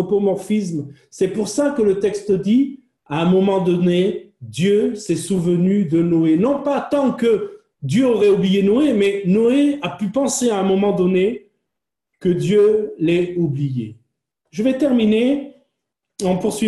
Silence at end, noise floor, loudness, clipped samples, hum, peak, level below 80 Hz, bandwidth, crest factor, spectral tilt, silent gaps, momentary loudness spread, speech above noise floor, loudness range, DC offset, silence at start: 0 s; -81 dBFS; -18 LUFS; under 0.1%; none; -6 dBFS; -56 dBFS; 12.5 kHz; 12 dB; -6.5 dB/octave; none; 9 LU; 65 dB; 3 LU; under 0.1%; 0 s